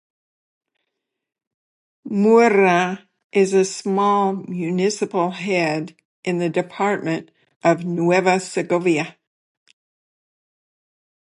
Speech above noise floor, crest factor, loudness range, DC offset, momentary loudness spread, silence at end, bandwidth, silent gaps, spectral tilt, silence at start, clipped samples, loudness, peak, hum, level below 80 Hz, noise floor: 61 dB; 18 dB; 4 LU; under 0.1%; 11 LU; 2.25 s; 11.5 kHz; 3.24-3.30 s, 6.05-6.23 s, 7.56-7.60 s; -5.5 dB/octave; 2.05 s; under 0.1%; -19 LUFS; -2 dBFS; none; -72 dBFS; -80 dBFS